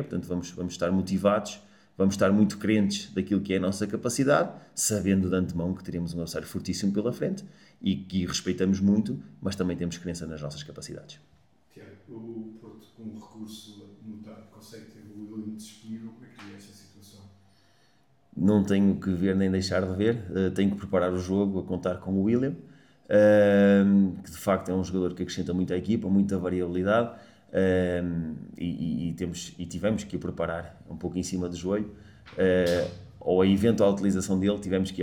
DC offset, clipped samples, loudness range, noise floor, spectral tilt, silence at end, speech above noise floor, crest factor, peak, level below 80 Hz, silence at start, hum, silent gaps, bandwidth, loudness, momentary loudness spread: under 0.1%; under 0.1%; 20 LU; -65 dBFS; -6 dB/octave; 0 s; 39 dB; 18 dB; -8 dBFS; -56 dBFS; 0 s; none; none; 17 kHz; -27 LUFS; 20 LU